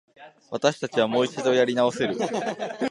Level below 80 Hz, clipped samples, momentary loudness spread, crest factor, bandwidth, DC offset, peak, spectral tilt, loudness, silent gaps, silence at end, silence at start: -70 dBFS; under 0.1%; 8 LU; 20 dB; 11.5 kHz; under 0.1%; -4 dBFS; -4.5 dB/octave; -24 LUFS; none; 0 s; 0.2 s